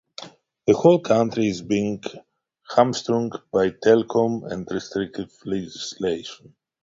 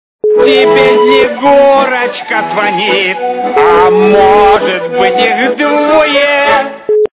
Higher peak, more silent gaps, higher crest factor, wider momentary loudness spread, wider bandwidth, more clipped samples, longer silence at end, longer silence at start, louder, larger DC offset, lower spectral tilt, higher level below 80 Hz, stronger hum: about the same, -2 dBFS vs 0 dBFS; neither; first, 20 dB vs 8 dB; first, 15 LU vs 7 LU; first, 7.8 kHz vs 4 kHz; second, under 0.1% vs 0.2%; first, 0.5 s vs 0.15 s; about the same, 0.2 s vs 0.25 s; second, -22 LUFS vs -8 LUFS; neither; second, -6 dB/octave vs -8 dB/octave; second, -58 dBFS vs -40 dBFS; neither